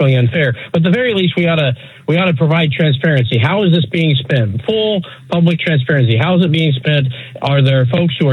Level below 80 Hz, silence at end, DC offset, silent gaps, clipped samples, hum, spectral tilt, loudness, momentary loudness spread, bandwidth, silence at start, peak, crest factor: -56 dBFS; 0 s; under 0.1%; none; under 0.1%; none; -8.5 dB/octave; -14 LUFS; 4 LU; 4.6 kHz; 0 s; -2 dBFS; 12 dB